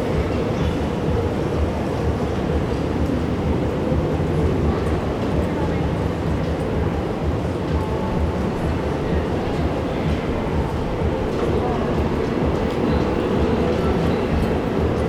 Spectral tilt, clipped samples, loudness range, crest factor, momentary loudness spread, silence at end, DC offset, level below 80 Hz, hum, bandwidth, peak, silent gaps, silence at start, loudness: -8 dB/octave; under 0.1%; 2 LU; 14 dB; 3 LU; 0 s; under 0.1%; -28 dBFS; none; 12.5 kHz; -6 dBFS; none; 0 s; -22 LUFS